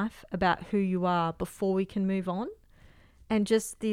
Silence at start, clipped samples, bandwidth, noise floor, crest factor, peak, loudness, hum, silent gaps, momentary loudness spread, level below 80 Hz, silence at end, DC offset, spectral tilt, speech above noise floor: 0 s; under 0.1%; 15 kHz; -56 dBFS; 18 dB; -12 dBFS; -29 LUFS; none; none; 7 LU; -54 dBFS; 0 s; under 0.1%; -6 dB/octave; 28 dB